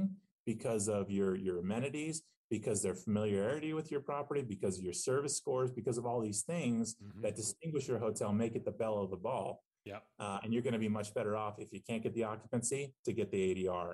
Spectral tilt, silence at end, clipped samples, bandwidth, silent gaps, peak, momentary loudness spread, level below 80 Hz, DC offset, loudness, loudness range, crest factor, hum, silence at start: -5 dB/octave; 0 s; under 0.1%; 12.5 kHz; 0.31-0.46 s, 2.36-2.50 s, 9.66-9.71 s, 12.99-13.03 s; -24 dBFS; 7 LU; -74 dBFS; under 0.1%; -38 LUFS; 2 LU; 14 dB; none; 0 s